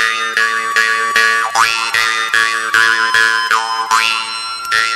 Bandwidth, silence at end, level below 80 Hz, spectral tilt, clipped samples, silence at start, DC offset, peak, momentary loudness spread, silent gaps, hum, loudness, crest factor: 15 kHz; 0 s; -58 dBFS; 1 dB/octave; under 0.1%; 0 s; under 0.1%; 0 dBFS; 4 LU; none; none; -12 LUFS; 14 dB